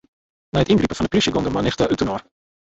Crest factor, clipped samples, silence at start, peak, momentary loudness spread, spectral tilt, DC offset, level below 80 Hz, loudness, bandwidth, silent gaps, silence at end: 16 dB; under 0.1%; 0.55 s; -4 dBFS; 7 LU; -5.5 dB/octave; under 0.1%; -40 dBFS; -20 LUFS; 8.2 kHz; none; 0.5 s